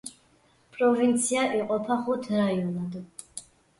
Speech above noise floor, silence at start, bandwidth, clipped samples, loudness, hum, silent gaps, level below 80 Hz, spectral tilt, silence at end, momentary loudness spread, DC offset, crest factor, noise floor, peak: 37 dB; 0.05 s; 11.5 kHz; under 0.1%; -26 LUFS; none; none; -68 dBFS; -5 dB/octave; 0.4 s; 19 LU; under 0.1%; 16 dB; -62 dBFS; -12 dBFS